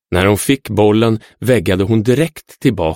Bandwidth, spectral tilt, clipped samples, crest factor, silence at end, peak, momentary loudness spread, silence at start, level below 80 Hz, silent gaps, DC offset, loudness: 17 kHz; -6 dB/octave; under 0.1%; 14 dB; 0 s; 0 dBFS; 6 LU; 0.1 s; -40 dBFS; none; under 0.1%; -14 LUFS